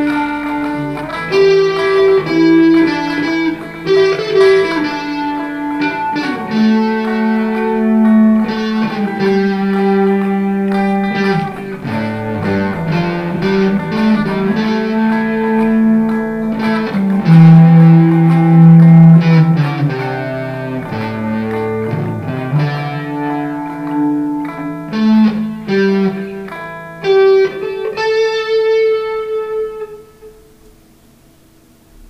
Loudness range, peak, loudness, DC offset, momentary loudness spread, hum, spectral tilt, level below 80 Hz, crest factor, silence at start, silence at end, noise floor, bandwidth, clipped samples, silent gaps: 10 LU; 0 dBFS; -13 LUFS; under 0.1%; 13 LU; none; -8.5 dB/octave; -46 dBFS; 12 dB; 0 s; 1.8 s; -46 dBFS; 6.2 kHz; 0.1%; none